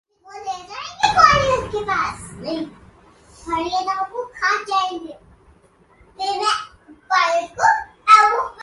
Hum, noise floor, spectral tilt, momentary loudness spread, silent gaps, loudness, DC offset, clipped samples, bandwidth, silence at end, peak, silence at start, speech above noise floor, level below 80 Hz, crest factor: none; -54 dBFS; -3 dB/octave; 19 LU; none; -18 LUFS; under 0.1%; under 0.1%; 11.5 kHz; 0 s; 0 dBFS; 0.25 s; 33 dB; -46 dBFS; 20 dB